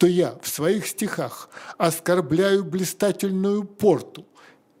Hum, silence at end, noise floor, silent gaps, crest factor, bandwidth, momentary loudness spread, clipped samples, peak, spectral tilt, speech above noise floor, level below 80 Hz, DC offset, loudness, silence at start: none; 0.6 s; -53 dBFS; none; 18 dB; 16 kHz; 10 LU; under 0.1%; -4 dBFS; -5 dB/octave; 31 dB; -64 dBFS; under 0.1%; -23 LUFS; 0 s